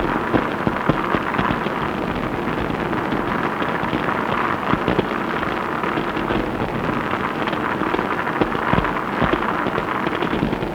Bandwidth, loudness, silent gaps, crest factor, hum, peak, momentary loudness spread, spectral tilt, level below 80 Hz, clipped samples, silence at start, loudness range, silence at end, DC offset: 19.5 kHz; -21 LUFS; none; 20 dB; none; -2 dBFS; 3 LU; -7 dB/octave; -40 dBFS; under 0.1%; 0 s; 1 LU; 0 s; under 0.1%